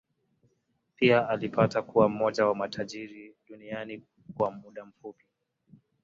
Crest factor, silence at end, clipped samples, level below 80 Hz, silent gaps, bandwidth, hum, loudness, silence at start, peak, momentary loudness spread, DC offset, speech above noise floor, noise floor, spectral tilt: 22 dB; 0.9 s; under 0.1%; -68 dBFS; none; 7.8 kHz; none; -27 LUFS; 1 s; -8 dBFS; 23 LU; under 0.1%; 47 dB; -75 dBFS; -6.5 dB/octave